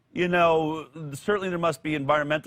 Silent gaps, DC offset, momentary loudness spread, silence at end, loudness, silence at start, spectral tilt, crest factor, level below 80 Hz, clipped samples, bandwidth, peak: none; under 0.1%; 12 LU; 0.05 s; -25 LUFS; 0.15 s; -6 dB/octave; 16 dB; -58 dBFS; under 0.1%; 16 kHz; -8 dBFS